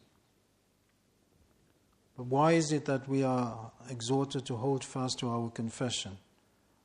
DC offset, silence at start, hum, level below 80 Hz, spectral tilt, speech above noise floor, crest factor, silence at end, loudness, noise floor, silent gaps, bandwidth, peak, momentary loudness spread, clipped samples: under 0.1%; 2.2 s; 50 Hz at -75 dBFS; -72 dBFS; -5.5 dB/octave; 39 dB; 20 dB; 0.65 s; -32 LUFS; -71 dBFS; none; 11 kHz; -14 dBFS; 16 LU; under 0.1%